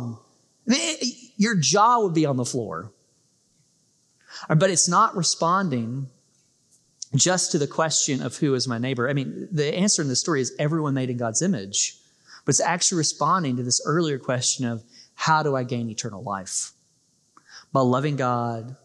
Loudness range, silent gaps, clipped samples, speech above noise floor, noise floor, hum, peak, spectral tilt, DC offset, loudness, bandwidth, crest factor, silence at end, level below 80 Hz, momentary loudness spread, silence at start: 3 LU; none; under 0.1%; 42 dB; -65 dBFS; none; -6 dBFS; -3.5 dB/octave; under 0.1%; -23 LUFS; 12 kHz; 18 dB; 0.1 s; -76 dBFS; 12 LU; 0 s